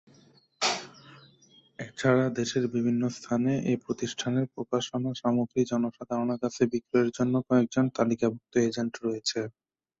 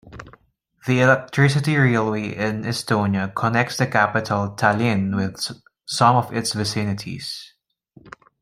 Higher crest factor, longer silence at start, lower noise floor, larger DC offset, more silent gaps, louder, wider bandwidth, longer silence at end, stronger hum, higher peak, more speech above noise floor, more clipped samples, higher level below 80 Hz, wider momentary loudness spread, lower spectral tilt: about the same, 18 dB vs 20 dB; first, 0.6 s vs 0.05 s; about the same, -60 dBFS vs -57 dBFS; neither; neither; second, -28 LUFS vs -20 LUFS; second, 8.2 kHz vs 15.5 kHz; first, 0.5 s vs 0.35 s; neither; second, -10 dBFS vs -2 dBFS; second, 33 dB vs 37 dB; neither; second, -66 dBFS vs -56 dBFS; second, 6 LU vs 13 LU; about the same, -5.5 dB/octave vs -5.5 dB/octave